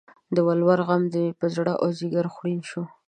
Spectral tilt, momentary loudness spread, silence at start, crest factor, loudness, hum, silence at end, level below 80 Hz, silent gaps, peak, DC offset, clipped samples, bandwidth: -8 dB/octave; 9 LU; 0.3 s; 18 dB; -24 LUFS; none; 0.2 s; -70 dBFS; none; -6 dBFS; under 0.1%; under 0.1%; 9.4 kHz